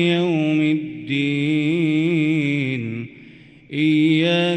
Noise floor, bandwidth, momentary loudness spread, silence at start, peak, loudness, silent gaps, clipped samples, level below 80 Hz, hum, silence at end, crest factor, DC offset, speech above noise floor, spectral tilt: -45 dBFS; 8.8 kHz; 10 LU; 0 s; -8 dBFS; -19 LUFS; none; under 0.1%; -64 dBFS; none; 0 s; 12 dB; under 0.1%; 26 dB; -7 dB/octave